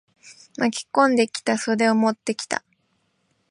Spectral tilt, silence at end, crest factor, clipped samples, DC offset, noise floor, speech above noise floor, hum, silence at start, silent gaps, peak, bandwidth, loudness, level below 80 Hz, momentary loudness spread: -4 dB/octave; 0.9 s; 18 dB; under 0.1%; under 0.1%; -69 dBFS; 48 dB; none; 0.25 s; none; -4 dBFS; 11.5 kHz; -22 LUFS; -74 dBFS; 10 LU